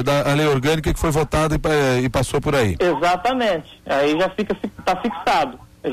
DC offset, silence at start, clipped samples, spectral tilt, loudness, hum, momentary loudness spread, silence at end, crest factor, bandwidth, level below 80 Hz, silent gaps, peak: under 0.1%; 0 s; under 0.1%; -5.5 dB/octave; -19 LUFS; none; 6 LU; 0 s; 8 dB; 15 kHz; -34 dBFS; none; -10 dBFS